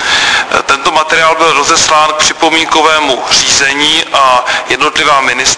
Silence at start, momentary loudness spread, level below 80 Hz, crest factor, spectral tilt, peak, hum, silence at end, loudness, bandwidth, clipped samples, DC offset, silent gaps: 0 s; 3 LU; -40 dBFS; 8 dB; -0.5 dB/octave; 0 dBFS; none; 0 s; -7 LUFS; 11 kHz; 0.8%; 0.3%; none